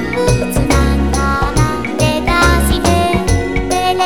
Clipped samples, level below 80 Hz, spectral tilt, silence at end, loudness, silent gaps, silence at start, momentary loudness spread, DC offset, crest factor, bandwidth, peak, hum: under 0.1%; -20 dBFS; -5 dB/octave; 0 s; -14 LUFS; none; 0 s; 4 LU; 2%; 14 dB; 18 kHz; 0 dBFS; none